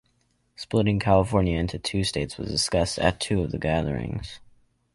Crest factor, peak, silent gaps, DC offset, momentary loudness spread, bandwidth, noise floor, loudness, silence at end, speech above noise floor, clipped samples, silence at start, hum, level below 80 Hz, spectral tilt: 20 dB; -6 dBFS; none; under 0.1%; 10 LU; 11.5 kHz; -68 dBFS; -25 LUFS; 0.55 s; 44 dB; under 0.1%; 0.6 s; none; -40 dBFS; -5 dB/octave